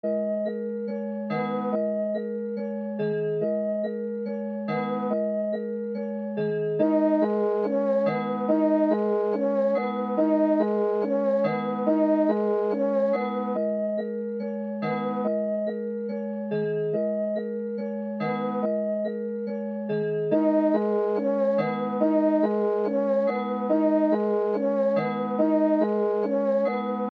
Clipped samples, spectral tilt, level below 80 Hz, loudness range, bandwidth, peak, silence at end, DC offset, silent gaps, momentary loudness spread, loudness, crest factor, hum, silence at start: under 0.1%; -9.5 dB/octave; -84 dBFS; 5 LU; 5 kHz; -10 dBFS; 0.05 s; under 0.1%; none; 9 LU; -26 LUFS; 14 dB; none; 0.05 s